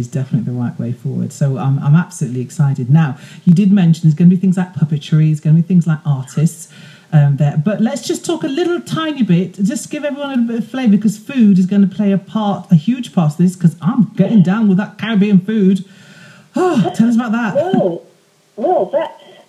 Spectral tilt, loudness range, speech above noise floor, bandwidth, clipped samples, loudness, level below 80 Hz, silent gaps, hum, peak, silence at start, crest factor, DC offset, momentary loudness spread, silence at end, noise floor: -7.5 dB/octave; 4 LU; 35 dB; 12.5 kHz; under 0.1%; -15 LUFS; -62 dBFS; none; none; 0 dBFS; 0 s; 14 dB; under 0.1%; 9 LU; 0.35 s; -49 dBFS